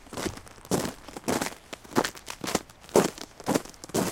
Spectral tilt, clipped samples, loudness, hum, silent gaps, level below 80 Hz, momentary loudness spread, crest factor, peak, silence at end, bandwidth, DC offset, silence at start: -4 dB/octave; under 0.1%; -30 LUFS; none; none; -54 dBFS; 11 LU; 28 dB; -2 dBFS; 0 s; 17 kHz; under 0.1%; 0.1 s